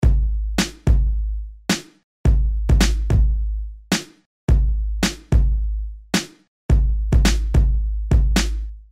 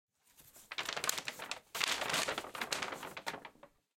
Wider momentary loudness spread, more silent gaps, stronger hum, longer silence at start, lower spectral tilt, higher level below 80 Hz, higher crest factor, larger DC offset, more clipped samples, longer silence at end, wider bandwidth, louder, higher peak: about the same, 10 LU vs 11 LU; first, 2.03-2.24 s, 4.26-4.48 s, 6.48-6.69 s vs none; neither; second, 0 s vs 0.4 s; first, -5 dB/octave vs -0.5 dB/octave; first, -20 dBFS vs -74 dBFS; second, 14 dB vs 30 dB; first, 0.2% vs under 0.1%; neither; second, 0.1 s vs 0.3 s; second, 13.5 kHz vs 17 kHz; first, -21 LUFS vs -38 LUFS; first, -6 dBFS vs -12 dBFS